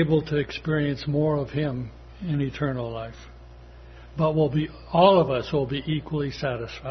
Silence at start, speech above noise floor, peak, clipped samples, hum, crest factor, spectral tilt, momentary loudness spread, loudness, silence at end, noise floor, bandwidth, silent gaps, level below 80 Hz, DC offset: 0 s; 21 dB; -4 dBFS; under 0.1%; none; 22 dB; -8 dB/octave; 15 LU; -25 LUFS; 0 s; -45 dBFS; 6.4 kHz; none; -46 dBFS; under 0.1%